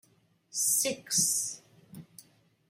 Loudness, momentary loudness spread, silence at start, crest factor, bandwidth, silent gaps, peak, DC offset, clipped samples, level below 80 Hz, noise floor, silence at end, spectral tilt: -28 LUFS; 22 LU; 0.55 s; 20 dB; 16 kHz; none; -14 dBFS; under 0.1%; under 0.1%; -74 dBFS; -67 dBFS; 0.5 s; -0.5 dB/octave